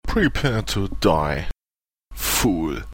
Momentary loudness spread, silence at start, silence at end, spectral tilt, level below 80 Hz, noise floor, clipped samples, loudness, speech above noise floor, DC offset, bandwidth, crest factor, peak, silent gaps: 7 LU; 0.05 s; 0 s; -4.5 dB/octave; -32 dBFS; under -90 dBFS; under 0.1%; -22 LUFS; over 69 dB; under 0.1%; 17 kHz; 18 dB; -4 dBFS; none